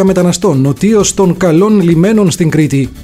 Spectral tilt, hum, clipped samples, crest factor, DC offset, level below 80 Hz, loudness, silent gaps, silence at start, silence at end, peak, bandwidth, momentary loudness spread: -6 dB/octave; none; under 0.1%; 8 dB; under 0.1%; -36 dBFS; -9 LUFS; none; 0 s; 0 s; 0 dBFS; 15.5 kHz; 3 LU